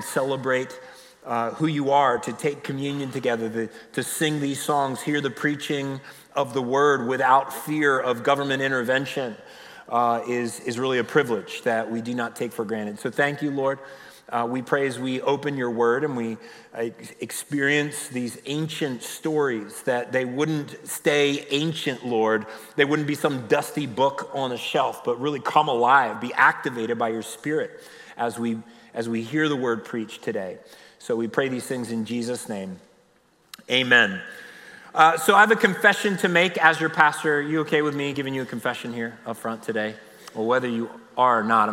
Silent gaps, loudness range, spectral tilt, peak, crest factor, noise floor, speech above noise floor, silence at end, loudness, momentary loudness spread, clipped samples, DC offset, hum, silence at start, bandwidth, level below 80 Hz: none; 8 LU; -4.5 dB/octave; -4 dBFS; 20 dB; -61 dBFS; 37 dB; 0 s; -24 LUFS; 13 LU; under 0.1%; under 0.1%; none; 0 s; 16 kHz; -74 dBFS